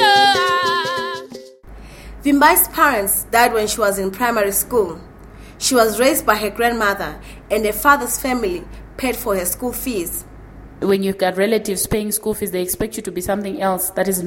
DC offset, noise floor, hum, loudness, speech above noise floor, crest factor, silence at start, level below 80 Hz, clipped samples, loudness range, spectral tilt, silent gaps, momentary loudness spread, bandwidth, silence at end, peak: under 0.1%; -39 dBFS; none; -17 LUFS; 21 dB; 18 dB; 0 s; -40 dBFS; under 0.1%; 5 LU; -3 dB/octave; none; 12 LU; 17 kHz; 0 s; 0 dBFS